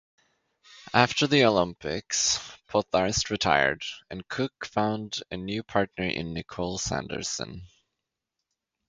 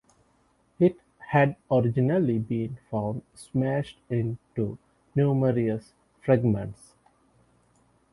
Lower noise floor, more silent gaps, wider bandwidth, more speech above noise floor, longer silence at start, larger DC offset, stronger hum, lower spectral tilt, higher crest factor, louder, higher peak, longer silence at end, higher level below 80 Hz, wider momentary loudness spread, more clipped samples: first, -85 dBFS vs -66 dBFS; neither; about the same, 10.5 kHz vs 11.5 kHz; first, 58 dB vs 40 dB; about the same, 0.7 s vs 0.8 s; neither; neither; second, -3.5 dB/octave vs -9 dB/octave; first, 26 dB vs 20 dB; about the same, -27 LUFS vs -27 LUFS; first, -2 dBFS vs -8 dBFS; second, 1.2 s vs 1.4 s; first, -52 dBFS vs -58 dBFS; about the same, 12 LU vs 10 LU; neither